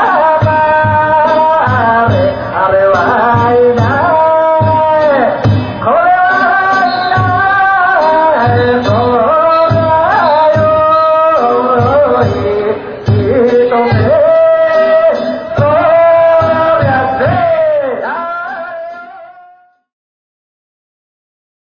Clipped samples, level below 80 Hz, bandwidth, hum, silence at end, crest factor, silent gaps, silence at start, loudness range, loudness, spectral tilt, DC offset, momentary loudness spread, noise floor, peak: under 0.1%; -36 dBFS; 6.8 kHz; none; 2.45 s; 10 dB; none; 0 s; 5 LU; -9 LUFS; -8 dB/octave; under 0.1%; 6 LU; -43 dBFS; 0 dBFS